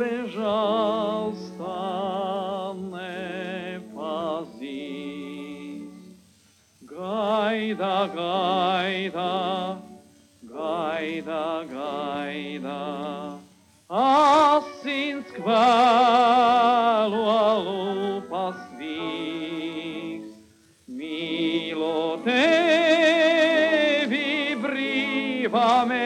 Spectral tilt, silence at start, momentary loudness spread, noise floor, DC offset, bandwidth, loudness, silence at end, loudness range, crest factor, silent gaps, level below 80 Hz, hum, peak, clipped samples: -5 dB/octave; 0 s; 17 LU; -59 dBFS; under 0.1%; 12.5 kHz; -23 LUFS; 0 s; 12 LU; 16 dB; none; -74 dBFS; none; -8 dBFS; under 0.1%